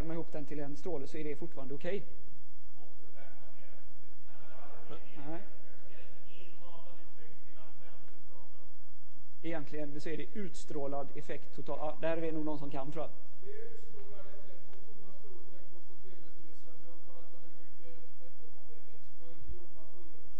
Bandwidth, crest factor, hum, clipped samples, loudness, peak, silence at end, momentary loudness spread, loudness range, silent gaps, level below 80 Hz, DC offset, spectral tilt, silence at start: 8.4 kHz; 24 dB; none; under 0.1%; -43 LUFS; -16 dBFS; 0 s; 22 LU; 20 LU; none; -62 dBFS; 8%; -7.5 dB/octave; 0 s